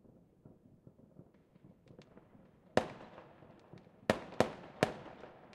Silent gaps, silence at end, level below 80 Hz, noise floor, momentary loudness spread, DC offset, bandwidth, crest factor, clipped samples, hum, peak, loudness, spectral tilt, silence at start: none; 0 s; -70 dBFS; -63 dBFS; 24 LU; under 0.1%; 14.5 kHz; 32 dB; under 0.1%; none; -10 dBFS; -38 LUFS; -5.5 dB/octave; 0.45 s